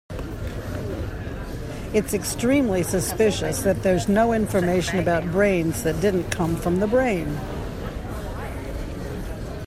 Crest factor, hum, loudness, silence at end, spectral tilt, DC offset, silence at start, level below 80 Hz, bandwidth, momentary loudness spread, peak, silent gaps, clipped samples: 18 dB; none; -24 LUFS; 0 s; -5.5 dB/octave; under 0.1%; 0.1 s; -36 dBFS; 16 kHz; 12 LU; -4 dBFS; none; under 0.1%